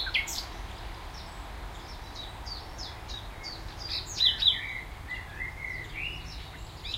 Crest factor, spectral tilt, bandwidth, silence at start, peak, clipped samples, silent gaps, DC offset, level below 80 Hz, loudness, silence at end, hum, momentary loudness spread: 24 dB; -1.5 dB/octave; 16 kHz; 0 s; -10 dBFS; under 0.1%; none; under 0.1%; -44 dBFS; -32 LUFS; 0 s; none; 18 LU